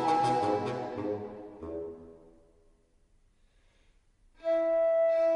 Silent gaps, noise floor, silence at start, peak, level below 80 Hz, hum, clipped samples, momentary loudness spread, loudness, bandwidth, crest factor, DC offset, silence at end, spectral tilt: none; -66 dBFS; 0 s; -16 dBFS; -64 dBFS; none; under 0.1%; 18 LU; -30 LUFS; 10.5 kHz; 16 dB; under 0.1%; 0 s; -6.5 dB/octave